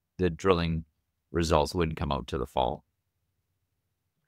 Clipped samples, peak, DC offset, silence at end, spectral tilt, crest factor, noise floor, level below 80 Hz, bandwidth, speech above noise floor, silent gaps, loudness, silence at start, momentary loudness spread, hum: under 0.1%; -4 dBFS; under 0.1%; 1.5 s; -6 dB/octave; 26 dB; -80 dBFS; -44 dBFS; 15.5 kHz; 53 dB; none; -29 LUFS; 0.2 s; 8 LU; none